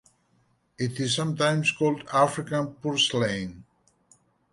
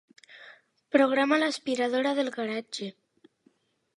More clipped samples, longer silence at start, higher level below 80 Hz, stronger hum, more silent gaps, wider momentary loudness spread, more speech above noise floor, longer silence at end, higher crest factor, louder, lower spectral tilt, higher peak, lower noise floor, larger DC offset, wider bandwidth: neither; first, 0.8 s vs 0.3 s; first, -62 dBFS vs -84 dBFS; neither; neither; second, 9 LU vs 14 LU; about the same, 42 dB vs 41 dB; second, 0.9 s vs 1.05 s; about the same, 20 dB vs 22 dB; about the same, -25 LUFS vs -27 LUFS; about the same, -4.5 dB/octave vs -3.5 dB/octave; about the same, -8 dBFS vs -8 dBFS; about the same, -67 dBFS vs -67 dBFS; neither; about the same, 11.5 kHz vs 11.5 kHz